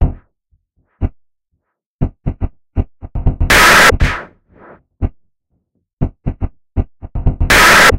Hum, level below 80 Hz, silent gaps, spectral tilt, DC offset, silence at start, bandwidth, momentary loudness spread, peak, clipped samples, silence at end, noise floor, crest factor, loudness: none; -22 dBFS; 1.86-1.99 s, 5.93-5.97 s; -3.5 dB/octave; under 0.1%; 0 s; 16.5 kHz; 19 LU; 0 dBFS; under 0.1%; 0 s; -69 dBFS; 14 dB; -13 LUFS